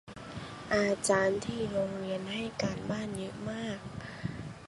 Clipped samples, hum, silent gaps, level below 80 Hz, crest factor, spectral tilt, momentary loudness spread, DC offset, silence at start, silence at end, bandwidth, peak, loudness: under 0.1%; none; none; -58 dBFS; 20 dB; -4.5 dB/octave; 15 LU; under 0.1%; 0.05 s; 0 s; 11.5 kHz; -14 dBFS; -33 LUFS